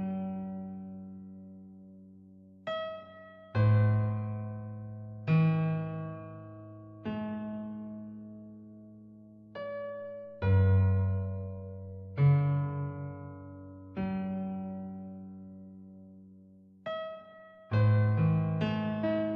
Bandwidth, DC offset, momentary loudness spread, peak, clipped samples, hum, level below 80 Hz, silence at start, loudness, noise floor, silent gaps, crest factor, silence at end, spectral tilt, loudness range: 5 kHz; under 0.1%; 24 LU; -16 dBFS; under 0.1%; none; -60 dBFS; 0 s; -32 LUFS; -56 dBFS; none; 16 dB; 0 s; -8.5 dB/octave; 12 LU